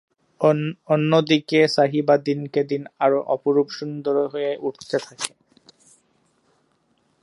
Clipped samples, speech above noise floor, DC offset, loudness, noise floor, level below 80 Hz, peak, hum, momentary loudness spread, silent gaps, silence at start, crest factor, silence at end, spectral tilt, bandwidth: under 0.1%; 45 dB; under 0.1%; -21 LUFS; -66 dBFS; -74 dBFS; -2 dBFS; none; 10 LU; none; 0.4 s; 20 dB; 1.95 s; -5.5 dB/octave; 11.5 kHz